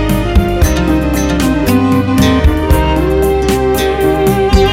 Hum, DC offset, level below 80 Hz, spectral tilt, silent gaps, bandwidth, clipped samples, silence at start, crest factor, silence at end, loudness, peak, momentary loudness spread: none; under 0.1%; -16 dBFS; -6 dB/octave; none; 16.5 kHz; under 0.1%; 0 s; 10 dB; 0 s; -12 LUFS; 0 dBFS; 2 LU